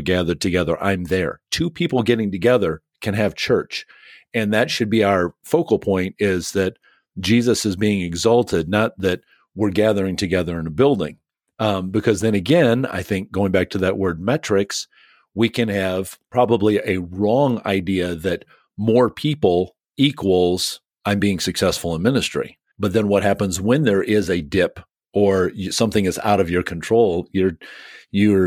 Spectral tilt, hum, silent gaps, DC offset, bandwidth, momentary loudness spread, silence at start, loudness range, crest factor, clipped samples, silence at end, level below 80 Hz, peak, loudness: -5.5 dB/octave; none; none; under 0.1%; 18 kHz; 8 LU; 0 s; 2 LU; 18 dB; under 0.1%; 0 s; -48 dBFS; -2 dBFS; -20 LUFS